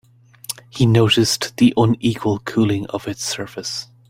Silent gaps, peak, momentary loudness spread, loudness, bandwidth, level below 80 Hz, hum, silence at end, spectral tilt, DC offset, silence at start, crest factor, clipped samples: none; -2 dBFS; 14 LU; -18 LUFS; 16 kHz; -50 dBFS; none; 0.25 s; -5 dB/octave; under 0.1%; 0.5 s; 16 dB; under 0.1%